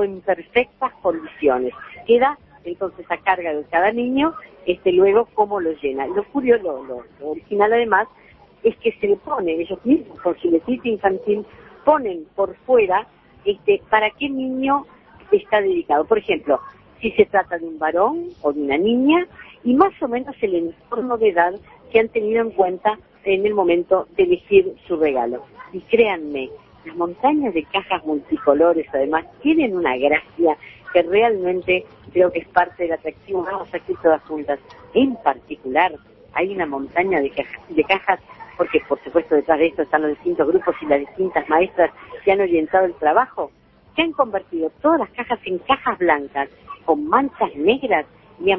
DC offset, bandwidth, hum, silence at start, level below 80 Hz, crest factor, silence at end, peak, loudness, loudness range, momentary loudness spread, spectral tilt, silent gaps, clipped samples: under 0.1%; 5.4 kHz; none; 0 s; -54 dBFS; 20 dB; 0 s; 0 dBFS; -20 LUFS; 2 LU; 10 LU; -8.5 dB/octave; none; under 0.1%